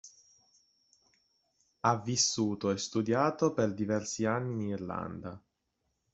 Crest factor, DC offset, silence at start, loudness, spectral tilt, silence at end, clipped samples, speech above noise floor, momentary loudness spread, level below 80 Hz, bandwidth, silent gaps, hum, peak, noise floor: 22 dB; under 0.1%; 0.05 s; -31 LUFS; -4.5 dB/octave; 0.75 s; under 0.1%; 49 dB; 10 LU; -70 dBFS; 8.2 kHz; none; none; -12 dBFS; -81 dBFS